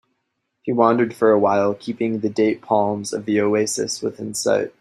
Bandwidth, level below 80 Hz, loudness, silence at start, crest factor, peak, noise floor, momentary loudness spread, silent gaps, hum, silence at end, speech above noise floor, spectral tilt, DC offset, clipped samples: 15 kHz; -64 dBFS; -20 LUFS; 0.65 s; 18 dB; -2 dBFS; -74 dBFS; 8 LU; none; none; 0.1 s; 55 dB; -4.5 dB/octave; under 0.1%; under 0.1%